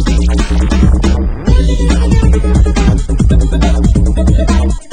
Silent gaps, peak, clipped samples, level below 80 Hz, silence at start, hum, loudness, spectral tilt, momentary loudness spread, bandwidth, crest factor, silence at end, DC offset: none; 0 dBFS; 0.6%; -10 dBFS; 0 s; none; -11 LUFS; -7 dB/octave; 2 LU; 10 kHz; 8 dB; 0.1 s; 3%